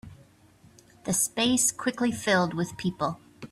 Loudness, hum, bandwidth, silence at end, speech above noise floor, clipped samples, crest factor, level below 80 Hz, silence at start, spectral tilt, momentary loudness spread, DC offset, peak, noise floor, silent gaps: -26 LUFS; none; 15.5 kHz; 0.05 s; 31 dB; under 0.1%; 18 dB; -60 dBFS; 0.05 s; -3 dB/octave; 9 LU; under 0.1%; -12 dBFS; -57 dBFS; none